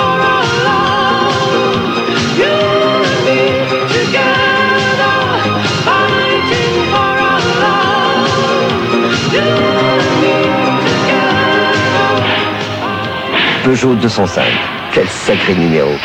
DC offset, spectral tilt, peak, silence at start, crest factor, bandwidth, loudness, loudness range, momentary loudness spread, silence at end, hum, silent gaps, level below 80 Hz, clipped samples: under 0.1%; -4.5 dB/octave; 0 dBFS; 0 s; 12 dB; 16.5 kHz; -11 LUFS; 1 LU; 3 LU; 0 s; none; none; -44 dBFS; under 0.1%